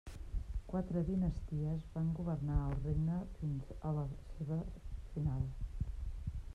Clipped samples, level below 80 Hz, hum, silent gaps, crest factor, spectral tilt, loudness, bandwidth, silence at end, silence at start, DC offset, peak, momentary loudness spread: under 0.1%; -44 dBFS; none; none; 16 dB; -10 dB/octave; -40 LUFS; 9.2 kHz; 0 s; 0.05 s; under 0.1%; -22 dBFS; 9 LU